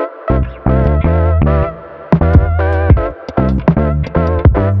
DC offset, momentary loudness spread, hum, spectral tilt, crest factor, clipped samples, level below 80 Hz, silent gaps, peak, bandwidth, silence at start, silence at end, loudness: under 0.1%; 6 LU; none; -11 dB/octave; 12 dB; under 0.1%; -16 dBFS; none; 0 dBFS; 5.2 kHz; 0 s; 0 s; -13 LUFS